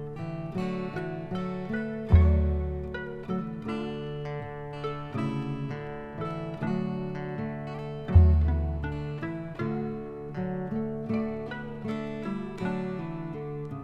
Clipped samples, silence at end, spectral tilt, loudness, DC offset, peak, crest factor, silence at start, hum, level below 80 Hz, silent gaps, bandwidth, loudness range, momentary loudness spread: under 0.1%; 0 s; -9.5 dB/octave; -31 LUFS; under 0.1%; -8 dBFS; 22 dB; 0 s; none; -34 dBFS; none; 5.2 kHz; 6 LU; 13 LU